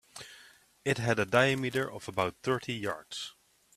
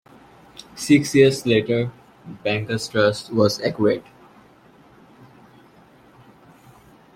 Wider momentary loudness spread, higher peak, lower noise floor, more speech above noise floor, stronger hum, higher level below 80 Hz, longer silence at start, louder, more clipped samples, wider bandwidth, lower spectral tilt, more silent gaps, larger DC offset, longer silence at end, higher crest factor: first, 18 LU vs 15 LU; second, -8 dBFS vs -2 dBFS; first, -58 dBFS vs -51 dBFS; second, 28 dB vs 32 dB; neither; second, -66 dBFS vs -58 dBFS; second, 0.15 s vs 0.75 s; second, -31 LUFS vs -20 LUFS; neither; about the same, 15 kHz vs 16 kHz; about the same, -5 dB/octave vs -5.5 dB/octave; neither; neither; second, 0.45 s vs 3.15 s; about the same, 24 dB vs 20 dB